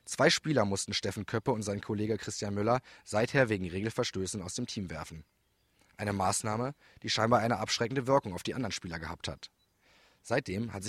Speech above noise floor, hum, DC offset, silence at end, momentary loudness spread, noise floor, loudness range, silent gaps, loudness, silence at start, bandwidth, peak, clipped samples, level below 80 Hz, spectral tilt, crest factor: 39 dB; none; under 0.1%; 0 s; 12 LU; -70 dBFS; 4 LU; none; -32 LUFS; 0.05 s; 15 kHz; -10 dBFS; under 0.1%; -60 dBFS; -4.5 dB/octave; 22 dB